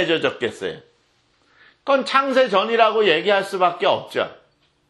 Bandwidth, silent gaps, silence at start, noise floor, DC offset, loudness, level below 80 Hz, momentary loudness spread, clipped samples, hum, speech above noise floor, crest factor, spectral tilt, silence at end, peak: 12 kHz; none; 0 s; -62 dBFS; under 0.1%; -19 LUFS; -68 dBFS; 14 LU; under 0.1%; none; 43 dB; 20 dB; -4 dB/octave; 0.55 s; 0 dBFS